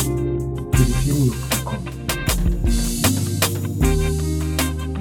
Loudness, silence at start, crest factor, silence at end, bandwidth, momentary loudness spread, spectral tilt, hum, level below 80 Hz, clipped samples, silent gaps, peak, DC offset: -21 LUFS; 0 s; 16 dB; 0 s; 19 kHz; 5 LU; -5 dB/octave; none; -24 dBFS; under 0.1%; none; -4 dBFS; under 0.1%